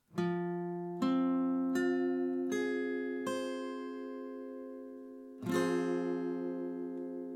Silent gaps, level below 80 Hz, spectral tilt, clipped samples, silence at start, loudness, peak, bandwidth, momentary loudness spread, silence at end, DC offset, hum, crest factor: none; -82 dBFS; -6.5 dB/octave; under 0.1%; 0.1 s; -36 LUFS; -20 dBFS; 14.5 kHz; 13 LU; 0 s; under 0.1%; none; 16 dB